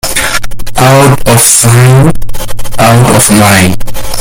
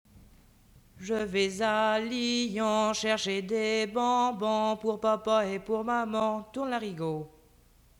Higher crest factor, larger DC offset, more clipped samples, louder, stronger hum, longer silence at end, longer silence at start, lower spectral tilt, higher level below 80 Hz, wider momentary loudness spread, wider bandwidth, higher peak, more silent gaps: second, 4 dB vs 16 dB; neither; first, 6% vs under 0.1%; first, -5 LUFS vs -29 LUFS; second, none vs 60 Hz at -55 dBFS; second, 0 s vs 0.7 s; about the same, 0.05 s vs 0.15 s; about the same, -4 dB/octave vs -4 dB/octave; first, -20 dBFS vs -62 dBFS; first, 14 LU vs 7 LU; about the same, over 20 kHz vs 19.5 kHz; first, 0 dBFS vs -14 dBFS; neither